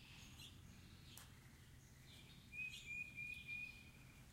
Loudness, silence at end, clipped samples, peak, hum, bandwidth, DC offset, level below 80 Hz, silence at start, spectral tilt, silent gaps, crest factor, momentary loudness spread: -53 LUFS; 0 s; under 0.1%; -36 dBFS; none; 16 kHz; under 0.1%; -70 dBFS; 0 s; -3 dB/octave; none; 20 dB; 15 LU